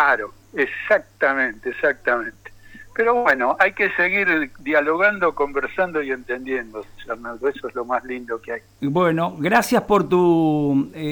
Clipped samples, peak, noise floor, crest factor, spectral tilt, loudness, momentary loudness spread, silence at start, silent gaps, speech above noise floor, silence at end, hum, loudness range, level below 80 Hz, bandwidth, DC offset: under 0.1%; -4 dBFS; -42 dBFS; 16 dB; -6 dB/octave; -20 LUFS; 12 LU; 0 s; none; 22 dB; 0 s; none; 6 LU; -52 dBFS; 19 kHz; under 0.1%